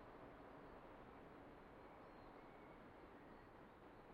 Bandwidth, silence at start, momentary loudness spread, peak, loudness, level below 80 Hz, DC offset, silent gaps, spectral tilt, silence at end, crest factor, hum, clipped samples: 5.6 kHz; 0 s; 2 LU; -48 dBFS; -62 LUFS; -72 dBFS; under 0.1%; none; -5 dB/octave; 0 s; 14 dB; none; under 0.1%